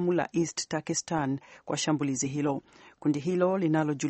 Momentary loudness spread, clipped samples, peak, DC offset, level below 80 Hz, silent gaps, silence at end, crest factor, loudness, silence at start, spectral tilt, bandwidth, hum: 7 LU; under 0.1%; -12 dBFS; under 0.1%; -68 dBFS; none; 0 s; 16 dB; -29 LUFS; 0 s; -5 dB/octave; 8.8 kHz; none